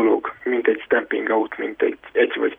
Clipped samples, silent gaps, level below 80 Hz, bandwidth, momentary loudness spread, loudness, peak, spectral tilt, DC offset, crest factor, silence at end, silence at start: under 0.1%; none; -64 dBFS; 3.7 kHz; 4 LU; -21 LUFS; -4 dBFS; -7 dB/octave; under 0.1%; 16 dB; 0.05 s; 0 s